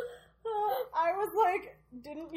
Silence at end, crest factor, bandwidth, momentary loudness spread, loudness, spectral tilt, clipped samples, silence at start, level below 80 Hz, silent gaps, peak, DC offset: 0 s; 16 dB; 16.5 kHz; 17 LU; -31 LUFS; -4 dB/octave; under 0.1%; 0 s; -68 dBFS; none; -16 dBFS; under 0.1%